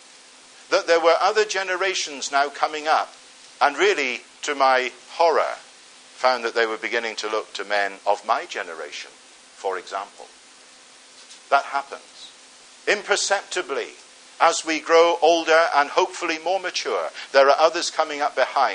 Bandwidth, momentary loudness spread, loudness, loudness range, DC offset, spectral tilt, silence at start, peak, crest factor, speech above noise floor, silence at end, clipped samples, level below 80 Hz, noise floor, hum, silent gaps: 10.5 kHz; 15 LU; -21 LUFS; 9 LU; under 0.1%; -0.5 dB/octave; 0.7 s; -2 dBFS; 20 dB; 27 dB; 0 s; under 0.1%; -82 dBFS; -49 dBFS; none; none